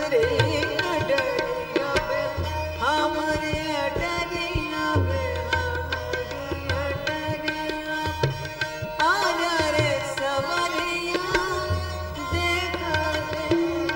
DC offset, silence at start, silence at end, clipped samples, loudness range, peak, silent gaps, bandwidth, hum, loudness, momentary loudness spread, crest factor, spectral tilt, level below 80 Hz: under 0.1%; 0 s; 0 s; under 0.1%; 3 LU; -6 dBFS; none; 16.5 kHz; none; -25 LUFS; 6 LU; 20 dB; -5 dB/octave; -40 dBFS